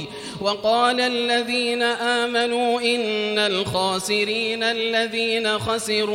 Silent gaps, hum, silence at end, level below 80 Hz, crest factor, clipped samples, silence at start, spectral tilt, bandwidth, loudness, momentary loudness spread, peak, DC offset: none; none; 0 s; -58 dBFS; 16 dB; under 0.1%; 0 s; -3 dB/octave; 16.5 kHz; -21 LUFS; 3 LU; -6 dBFS; under 0.1%